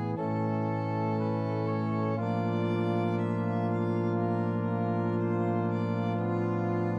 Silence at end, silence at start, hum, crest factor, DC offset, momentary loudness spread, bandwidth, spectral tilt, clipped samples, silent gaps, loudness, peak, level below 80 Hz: 0 s; 0 s; none; 12 dB; under 0.1%; 2 LU; 5.6 kHz; -10 dB/octave; under 0.1%; none; -30 LUFS; -16 dBFS; -70 dBFS